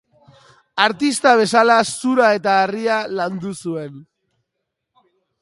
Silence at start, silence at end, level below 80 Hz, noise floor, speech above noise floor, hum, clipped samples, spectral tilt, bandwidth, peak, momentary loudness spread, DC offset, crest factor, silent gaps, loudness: 0.75 s; 1.4 s; -66 dBFS; -78 dBFS; 61 dB; none; under 0.1%; -3.5 dB/octave; 11.5 kHz; 0 dBFS; 14 LU; under 0.1%; 18 dB; none; -17 LUFS